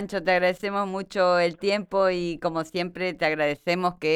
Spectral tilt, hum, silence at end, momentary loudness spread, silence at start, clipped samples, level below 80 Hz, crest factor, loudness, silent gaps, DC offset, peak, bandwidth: -5.5 dB/octave; none; 0 s; 7 LU; 0 s; under 0.1%; -58 dBFS; 16 dB; -25 LUFS; none; under 0.1%; -10 dBFS; 13 kHz